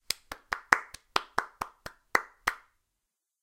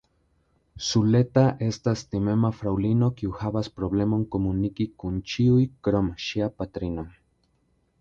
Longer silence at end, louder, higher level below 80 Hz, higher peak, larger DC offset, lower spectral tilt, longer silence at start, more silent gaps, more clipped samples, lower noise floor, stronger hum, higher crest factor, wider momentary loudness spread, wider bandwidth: about the same, 0.85 s vs 0.9 s; second, -32 LUFS vs -25 LUFS; second, -62 dBFS vs -46 dBFS; first, 0 dBFS vs -8 dBFS; neither; second, -1 dB/octave vs -7 dB/octave; second, 0.1 s vs 0.75 s; neither; neither; first, -85 dBFS vs -68 dBFS; neither; first, 34 dB vs 18 dB; first, 14 LU vs 10 LU; first, 17 kHz vs 7.6 kHz